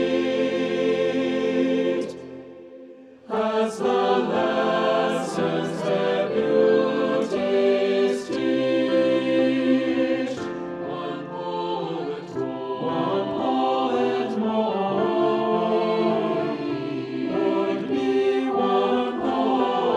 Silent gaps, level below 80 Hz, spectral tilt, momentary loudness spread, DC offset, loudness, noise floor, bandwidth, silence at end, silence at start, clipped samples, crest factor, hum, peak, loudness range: none; -64 dBFS; -6 dB/octave; 9 LU; under 0.1%; -23 LUFS; -45 dBFS; 11 kHz; 0 s; 0 s; under 0.1%; 14 dB; none; -8 dBFS; 4 LU